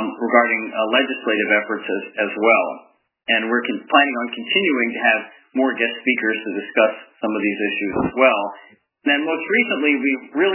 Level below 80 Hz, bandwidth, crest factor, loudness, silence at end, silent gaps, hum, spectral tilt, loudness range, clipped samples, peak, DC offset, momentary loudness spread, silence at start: -60 dBFS; 3.2 kHz; 20 dB; -19 LUFS; 0 s; none; none; -7.5 dB/octave; 2 LU; under 0.1%; 0 dBFS; under 0.1%; 9 LU; 0 s